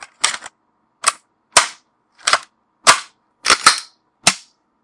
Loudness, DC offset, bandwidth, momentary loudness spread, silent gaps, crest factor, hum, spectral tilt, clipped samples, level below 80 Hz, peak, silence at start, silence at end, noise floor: -16 LUFS; under 0.1%; 12 kHz; 12 LU; none; 20 dB; none; 1 dB/octave; 0.1%; -58 dBFS; 0 dBFS; 0.25 s; 0.45 s; -65 dBFS